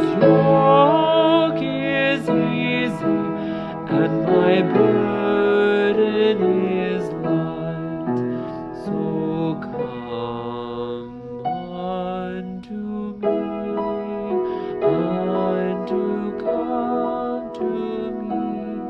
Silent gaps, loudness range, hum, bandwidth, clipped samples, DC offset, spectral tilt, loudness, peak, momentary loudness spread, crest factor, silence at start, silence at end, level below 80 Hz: none; 9 LU; none; 8 kHz; under 0.1%; under 0.1%; -8 dB/octave; -21 LUFS; -2 dBFS; 12 LU; 18 dB; 0 s; 0 s; -54 dBFS